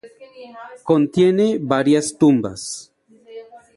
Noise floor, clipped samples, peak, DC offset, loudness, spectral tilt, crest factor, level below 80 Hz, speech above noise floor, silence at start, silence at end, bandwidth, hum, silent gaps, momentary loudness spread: -40 dBFS; under 0.1%; -2 dBFS; under 0.1%; -17 LUFS; -5.5 dB/octave; 16 dB; -58 dBFS; 22 dB; 0.05 s; 0.2 s; 11.5 kHz; none; none; 23 LU